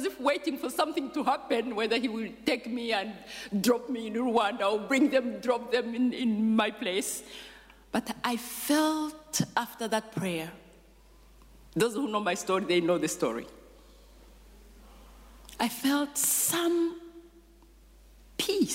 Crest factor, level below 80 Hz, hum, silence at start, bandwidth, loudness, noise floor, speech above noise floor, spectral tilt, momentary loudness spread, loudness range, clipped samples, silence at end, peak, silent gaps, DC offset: 18 dB; -60 dBFS; none; 0 s; 16 kHz; -29 LUFS; -56 dBFS; 27 dB; -3.5 dB/octave; 9 LU; 5 LU; under 0.1%; 0 s; -14 dBFS; none; under 0.1%